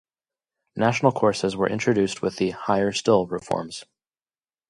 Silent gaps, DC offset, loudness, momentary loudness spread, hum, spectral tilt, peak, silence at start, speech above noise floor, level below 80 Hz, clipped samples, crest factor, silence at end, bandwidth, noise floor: none; under 0.1%; -23 LUFS; 8 LU; none; -5.5 dB/octave; -4 dBFS; 0.75 s; over 67 dB; -58 dBFS; under 0.1%; 20 dB; 0.85 s; 11.5 kHz; under -90 dBFS